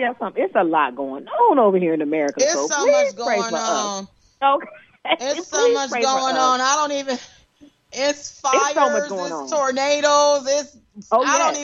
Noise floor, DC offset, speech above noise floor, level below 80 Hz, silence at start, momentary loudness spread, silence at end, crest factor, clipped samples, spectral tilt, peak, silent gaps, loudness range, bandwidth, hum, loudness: -52 dBFS; under 0.1%; 33 dB; -68 dBFS; 0 s; 10 LU; 0 s; 16 dB; under 0.1%; -2 dB/octave; -4 dBFS; none; 2 LU; 8 kHz; none; -19 LUFS